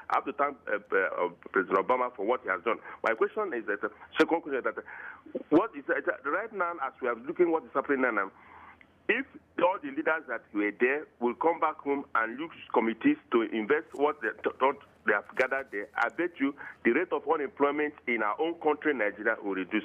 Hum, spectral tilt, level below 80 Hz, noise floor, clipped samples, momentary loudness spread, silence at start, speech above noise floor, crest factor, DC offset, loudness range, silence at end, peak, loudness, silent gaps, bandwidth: none; -6 dB/octave; -74 dBFS; -55 dBFS; under 0.1%; 6 LU; 0 s; 25 dB; 16 dB; under 0.1%; 2 LU; 0 s; -14 dBFS; -30 LUFS; none; 8.6 kHz